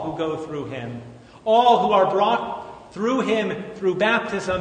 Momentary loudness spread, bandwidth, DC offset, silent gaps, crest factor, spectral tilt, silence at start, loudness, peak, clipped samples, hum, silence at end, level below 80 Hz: 16 LU; 9.6 kHz; under 0.1%; none; 18 dB; -5.5 dB/octave; 0 s; -21 LUFS; -4 dBFS; under 0.1%; none; 0 s; -56 dBFS